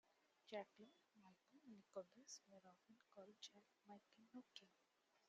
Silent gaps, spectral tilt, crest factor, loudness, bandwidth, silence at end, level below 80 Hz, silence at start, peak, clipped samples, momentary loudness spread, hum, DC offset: none; -2.5 dB/octave; 24 dB; -62 LUFS; 7.4 kHz; 0 s; under -90 dBFS; 0.05 s; -40 dBFS; under 0.1%; 11 LU; none; under 0.1%